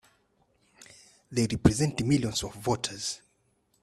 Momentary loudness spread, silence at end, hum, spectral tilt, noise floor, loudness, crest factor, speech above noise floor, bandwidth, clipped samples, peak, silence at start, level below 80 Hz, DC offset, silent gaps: 10 LU; 0.65 s; none; -5 dB/octave; -71 dBFS; -28 LUFS; 24 dB; 43 dB; 14 kHz; under 0.1%; -6 dBFS; 1.3 s; -48 dBFS; under 0.1%; none